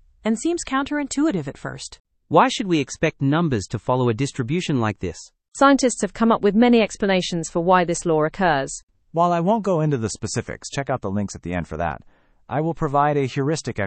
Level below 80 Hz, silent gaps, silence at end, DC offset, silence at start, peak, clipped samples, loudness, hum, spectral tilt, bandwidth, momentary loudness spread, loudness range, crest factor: -48 dBFS; 2.00-2.05 s, 8.83-8.87 s; 0 s; under 0.1%; 0.25 s; -2 dBFS; under 0.1%; -21 LUFS; none; -5.5 dB/octave; 8.8 kHz; 12 LU; 5 LU; 20 dB